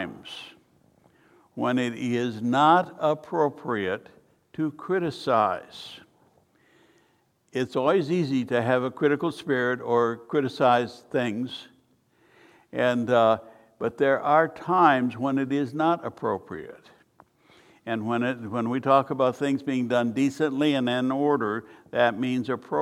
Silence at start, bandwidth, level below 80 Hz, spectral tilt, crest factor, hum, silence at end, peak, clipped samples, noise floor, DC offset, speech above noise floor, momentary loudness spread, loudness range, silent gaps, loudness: 0 s; 13 kHz; -72 dBFS; -6.5 dB/octave; 20 dB; none; 0 s; -6 dBFS; under 0.1%; -66 dBFS; under 0.1%; 42 dB; 14 LU; 6 LU; none; -25 LUFS